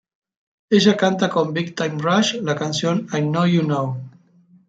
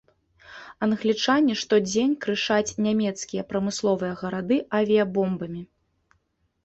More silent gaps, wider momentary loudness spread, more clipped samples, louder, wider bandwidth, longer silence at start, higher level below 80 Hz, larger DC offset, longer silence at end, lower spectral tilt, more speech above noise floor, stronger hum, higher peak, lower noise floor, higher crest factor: neither; second, 7 LU vs 10 LU; neither; first, -19 LUFS vs -24 LUFS; about the same, 9 kHz vs 8.2 kHz; first, 0.7 s vs 0.5 s; about the same, -64 dBFS vs -62 dBFS; neither; second, 0.6 s vs 1 s; about the same, -5.5 dB/octave vs -4.5 dB/octave; second, 35 dB vs 47 dB; neither; first, -2 dBFS vs -8 dBFS; second, -54 dBFS vs -71 dBFS; about the same, 18 dB vs 16 dB